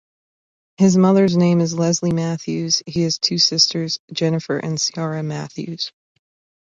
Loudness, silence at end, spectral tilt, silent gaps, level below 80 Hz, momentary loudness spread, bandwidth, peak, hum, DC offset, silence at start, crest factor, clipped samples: -18 LUFS; 0.75 s; -4.5 dB/octave; 4.00-4.08 s; -58 dBFS; 13 LU; 7.6 kHz; -2 dBFS; none; under 0.1%; 0.8 s; 18 dB; under 0.1%